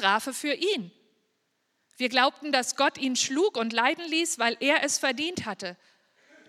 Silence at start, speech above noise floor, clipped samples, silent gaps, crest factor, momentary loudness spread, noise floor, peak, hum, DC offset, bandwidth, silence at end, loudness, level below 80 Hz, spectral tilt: 0 s; 48 dB; under 0.1%; none; 22 dB; 9 LU; -75 dBFS; -6 dBFS; none; under 0.1%; 16 kHz; 0.75 s; -26 LUFS; -74 dBFS; -1.5 dB/octave